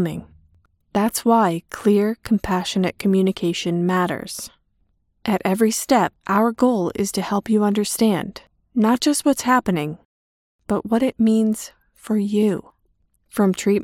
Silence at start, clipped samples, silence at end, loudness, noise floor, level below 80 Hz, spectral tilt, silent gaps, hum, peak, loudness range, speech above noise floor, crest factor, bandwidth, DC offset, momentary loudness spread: 0 s; under 0.1%; 0 s; -20 LUFS; -65 dBFS; -54 dBFS; -5.5 dB/octave; 10.05-10.59 s; none; -2 dBFS; 3 LU; 46 dB; 18 dB; 16.5 kHz; under 0.1%; 11 LU